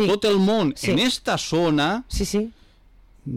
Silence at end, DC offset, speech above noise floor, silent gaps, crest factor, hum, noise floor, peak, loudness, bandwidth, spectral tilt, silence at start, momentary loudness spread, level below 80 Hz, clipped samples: 0 s; under 0.1%; 31 dB; none; 10 dB; none; -52 dBFS; -14 dBFS; -21 LUFS; 16 kHz; -5 dB/octave; 0 s; 7 LU; -40 dBFS; under 0.1%